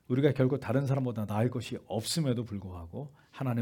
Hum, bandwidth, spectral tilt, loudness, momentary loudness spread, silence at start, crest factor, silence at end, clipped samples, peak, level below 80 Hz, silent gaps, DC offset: none; 18 kHz; -6.5 dB/octave; -31 LUFS; 15 LU; 0.1 s; 20 dB; 0 s; under 0.1%; -12 dBFS; -64 dBFS; none; under 0.1%